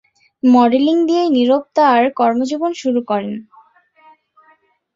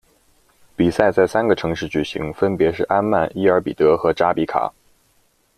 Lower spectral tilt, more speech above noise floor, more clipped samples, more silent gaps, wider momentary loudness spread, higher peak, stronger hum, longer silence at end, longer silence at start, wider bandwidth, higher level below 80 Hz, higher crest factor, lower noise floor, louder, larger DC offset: about the same, -5.5 dB/octave vs -6.5 dB/octave; about the same, 41 dB vs 43 dB; neither; neither; about the same, 9 LU vs 7 LU; about the same, -2 dBFS vs 0 dBFS; neither; first, 1.55 s vs 0.9 s; second, 0.45 s vs 0.8 s; second, 7.6 kHz vs 13.5 kHz; second, -64 dBFS vs -48 dBFS; about the same, 14 dB vs 18 dB; second, -55 dBFS vs -61 dBFS; first, -15 LUFS vs -19 LUFS; neither